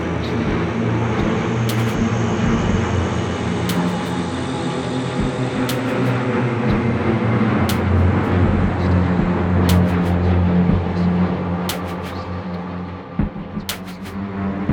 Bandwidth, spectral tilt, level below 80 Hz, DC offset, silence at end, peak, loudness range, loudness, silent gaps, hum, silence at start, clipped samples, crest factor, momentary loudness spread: over 20 kHz; -7 dB/octave; -34 dBFS; under 0.1%; 0 s; -2 dBFS; 5 LU; -20 LUFS; none; none; 0 s; under 0.1%; 16 dB; 10 LU